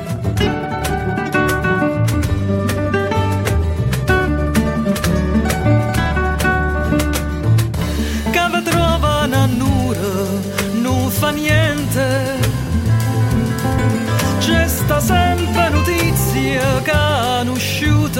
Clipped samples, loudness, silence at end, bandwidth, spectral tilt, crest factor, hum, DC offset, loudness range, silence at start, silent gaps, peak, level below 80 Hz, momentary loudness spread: under 0.1%; -16 LUFS; 0 s; 16.5 kHz; -5.5 dB/octave; 14 dB; none; under 0.1%; 2 LU; 0 s; none; -2 dBFS; -26 dBFS; 4 LU